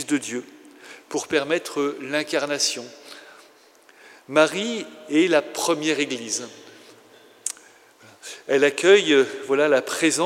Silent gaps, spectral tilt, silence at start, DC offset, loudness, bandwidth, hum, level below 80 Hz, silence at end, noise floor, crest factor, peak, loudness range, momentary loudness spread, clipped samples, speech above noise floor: none; -2.5 dB/octave; 0 s; under 0.1%; -22 LUFS; 16 kHz; none; -78 dBFS; 0 s; -53 dBFS; 22 dB; -2 dBFS; 5 LU; 20 LU; under 0.1%; 32 dB